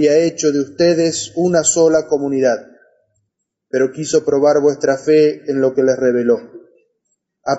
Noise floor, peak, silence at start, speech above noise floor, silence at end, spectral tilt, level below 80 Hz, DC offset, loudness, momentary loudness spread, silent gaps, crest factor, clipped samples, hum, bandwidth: -73 dBFS; -2 dBFS; 0 s; 59 dB; 0 s; -4.5 dB/octave; -58 dBFS; under 0.1%; -15 LUFS; 6 LU; none; 12 dB; under 0.1%; none; 8 kHz